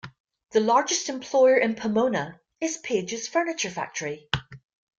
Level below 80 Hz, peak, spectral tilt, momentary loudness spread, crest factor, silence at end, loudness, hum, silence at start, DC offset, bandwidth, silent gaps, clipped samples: -58 dBFS; -2 dBFS; -3.5 dB/octave; 11 LU; 22 dB; 0.45 s; -25 LUFS; none; 0.05 s; under 0.1%; 7.8 kHz; 0.20-0.24 s; under 0.1%